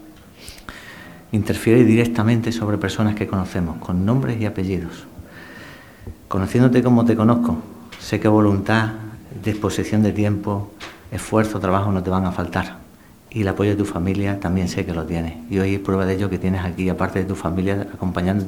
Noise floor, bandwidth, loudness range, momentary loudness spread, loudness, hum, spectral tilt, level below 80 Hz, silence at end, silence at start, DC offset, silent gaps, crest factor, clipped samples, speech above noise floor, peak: -46 dBFS; 16.5 kHz; 5 LU; 21 LU; -20 LUFS; none; -7 dB/octave; -44 dBFS; 0 s; 0 s; 0.1%; none; 20 dB; under 0.1%; 27 dB; 0 dBFS